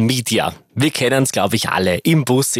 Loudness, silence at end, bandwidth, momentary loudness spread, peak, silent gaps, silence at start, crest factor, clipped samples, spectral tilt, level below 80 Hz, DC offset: -17 LUFS; 0 s; 16 kHz; 4 LU; 0 dBFS; none; 0 s; 16 dB; under 0.1%; -4.5 dB/octave; -56 dBFS; under 0.1%